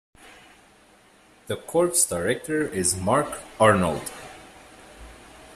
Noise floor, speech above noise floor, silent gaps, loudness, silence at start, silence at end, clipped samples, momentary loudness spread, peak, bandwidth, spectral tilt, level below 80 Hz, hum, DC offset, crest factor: -55 dBFS; 32 dB; none; -23 LUFS; 0.25 s; 0 s; under 0.1%; 17 LU; -4 dBFS; 15.5 kHz; -4 dB/octave; -54 dBFS; none; under 0.1%; 22 dB